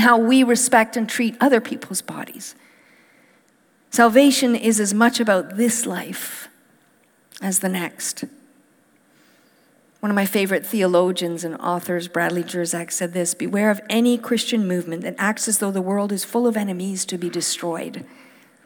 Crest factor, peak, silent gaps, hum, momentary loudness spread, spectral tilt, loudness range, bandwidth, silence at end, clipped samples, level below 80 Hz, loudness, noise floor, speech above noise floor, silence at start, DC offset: 20 dB; -2 dBFS; none; none; 14 LU; -3.5 dB/octave; 8 LU; over 20 kHz; 0.6 s; under 0.1%; -78 dBFS; -20 LUFS; -59 dBFS; 39 dB; 0 s; under 0.1%